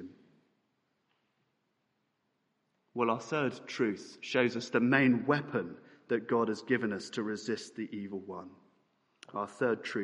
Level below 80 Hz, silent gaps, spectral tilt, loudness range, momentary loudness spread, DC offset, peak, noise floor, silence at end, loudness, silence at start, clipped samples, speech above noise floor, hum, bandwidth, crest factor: -80 dBFS; none; -5.5 dB/octave; 8 LU; 15 LU; under 0.1%; -10 dBFS; -79 dBFS; 0 s; -32 LUFS; 0 s; under 0.1%; 47 dB; none; 11 kHz; 24 dB